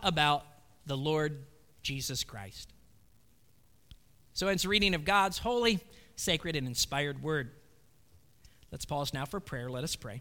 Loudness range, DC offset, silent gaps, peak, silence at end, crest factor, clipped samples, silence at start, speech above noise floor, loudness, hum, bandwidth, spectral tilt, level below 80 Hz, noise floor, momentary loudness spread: 8 LU; under 0.1%; none; -12 dBFS; 0 s; 22 dB; under 0.1%; 0 s; 34 dB; -32 LUFS; none; 19 kHz; -3.5 dB/octave; -52 dBFS; -67 dBFS; 18 LU